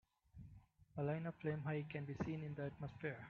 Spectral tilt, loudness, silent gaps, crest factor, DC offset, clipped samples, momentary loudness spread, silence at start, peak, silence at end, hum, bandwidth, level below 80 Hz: -7.5 dB/octave; -46 LUFS; none; 16 dB; under 0.1%; under 0.1%; 18 LU; 0.35 s; -30 dBFS; 0 s; none; 6.8 kHz; -70 dBFS